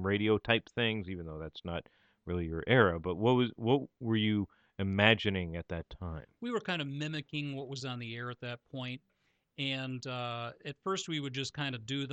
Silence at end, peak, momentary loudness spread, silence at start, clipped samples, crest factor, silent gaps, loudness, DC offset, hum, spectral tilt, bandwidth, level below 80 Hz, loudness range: 0 s; -8 dBFS; 15 LU; 0 s; under 0.1%; 26 dB; none; -34 LUFS; under 0.1%; none; -5.5 dB/octave; 8.8 kHz; -58 dBFS; 9 LU